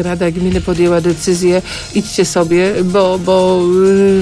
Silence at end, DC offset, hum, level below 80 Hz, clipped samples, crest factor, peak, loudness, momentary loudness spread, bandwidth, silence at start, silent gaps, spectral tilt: 0 s; under 0.1%; none; -34 dBFS; under 0.1%; 10 dB; -2 dBFS; -13 LUFS; 6 LU; 11 kHz; 0 s; none; -5.5 dB/octave